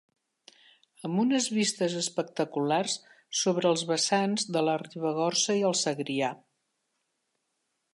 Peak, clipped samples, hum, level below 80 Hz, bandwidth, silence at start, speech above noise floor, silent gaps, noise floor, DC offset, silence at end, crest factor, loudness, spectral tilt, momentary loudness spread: -12 dBFS; under 0.1%; none; -82 dBFS; 11.5 kHz; 1.05 s; 51 dB; none; -79 dBFS; under 0.1%; 1.55 s; 18 dB; -28 LUFS; -3.5 dB/octave; 7 LU